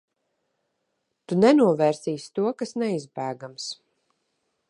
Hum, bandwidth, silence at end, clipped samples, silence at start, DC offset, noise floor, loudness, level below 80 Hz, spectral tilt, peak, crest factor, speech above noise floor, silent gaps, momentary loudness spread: none; 11 kHz; 0.95 s; under 0.1%; 1.3 s; under 0.1%; -77 dBFS; -24 LUFS; -72 dBFS; -6 dB/octave; -6 dBFS; 20 dB; 54 dB; none; 16 LU